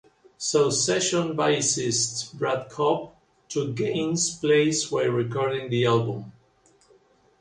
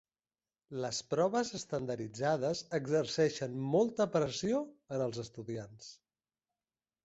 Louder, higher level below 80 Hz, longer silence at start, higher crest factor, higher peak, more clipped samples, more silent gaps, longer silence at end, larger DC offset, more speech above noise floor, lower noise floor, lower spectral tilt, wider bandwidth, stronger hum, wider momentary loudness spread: first, -24 LUFS vs -35 LUFS; first, -64 dBFS vs -70 dBFS; second, 0.4 s vs 0.7 s; about the same, 18 dB vs 18 dB; first, -8 dBFS vs -18 dBFS; neither; neither; about the same, 1.1 s vs 1.1 s; neither; second, 37 dB vs over 56 dB; second, -61 dBFS vs under -90 dBFS; second, -3.5 dB/octave vs -5 dB/octave; first, 11.5 kHz vs 8 kHz; neither; second, 8 LU vs 12 LU